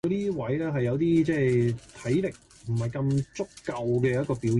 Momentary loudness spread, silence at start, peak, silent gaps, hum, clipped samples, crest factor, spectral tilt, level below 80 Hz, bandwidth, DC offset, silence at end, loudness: 11 LU; 0.05 s; -12 dBFS; none; none; under 0.1%; 14 dB; -8 dB/octave; -54 dBFS; 11.5 kHz; under 0.1%; 0 s; -27 LUFS